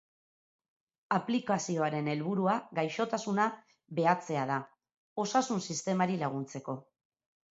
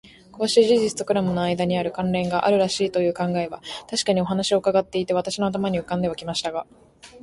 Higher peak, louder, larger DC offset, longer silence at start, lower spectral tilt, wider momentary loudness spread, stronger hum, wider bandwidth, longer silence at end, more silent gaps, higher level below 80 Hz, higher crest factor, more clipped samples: second, -12 dBFS vs -4 dBFS; second, -32 LUFS vs -22 LUFS; neither; first, 1.1 s vs 0.05 s; about the same, -5 dB/octave vs -5 dB/octave; about the same, 10 LU vs 8 LU; neither; second, 8 kHz vs 11.5 kHz; first, 0.75 s vs 0.05 s; first, 4.97-5.16 s vs none; second, -78 dBFS vs -54 dBFS; about the same, 22 dB vs 18 dB; neither